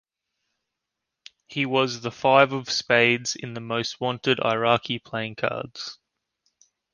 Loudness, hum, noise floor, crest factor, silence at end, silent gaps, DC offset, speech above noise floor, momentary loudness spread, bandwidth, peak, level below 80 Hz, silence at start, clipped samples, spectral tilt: -23 LUFS; none; -84 dBFS; 24 dB; 1 s; none; under 0.1%; 60 dB; 13 LU; 10 kHz; -2 dBFS; -66 dBFS; 1.5 s; under 0.1%; -4 dB/octave